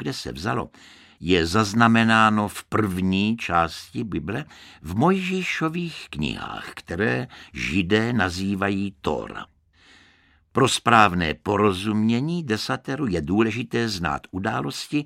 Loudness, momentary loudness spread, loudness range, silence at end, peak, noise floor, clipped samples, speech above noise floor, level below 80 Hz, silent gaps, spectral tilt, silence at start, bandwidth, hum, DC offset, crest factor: -23 LUFS; 14 LU; 5 LU; 0 s; 0 dBFS; -58 dBFS; under 0.1%; 36 dB; -48 dBFS; none; -5.5 dB/octave; 0 s; 15.5 kHz; none; under 0.1%; 24 dB